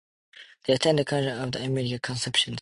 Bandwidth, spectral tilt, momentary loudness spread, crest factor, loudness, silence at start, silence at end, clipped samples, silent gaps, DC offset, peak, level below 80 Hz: 11.5 kHz; -4.5 dB/octave; 7 LU; 20 dB; -26 LUFS; 0.35 s; 0 s; under 0.1%; none; under 0.1%; -8 dBFS; -60 dBFS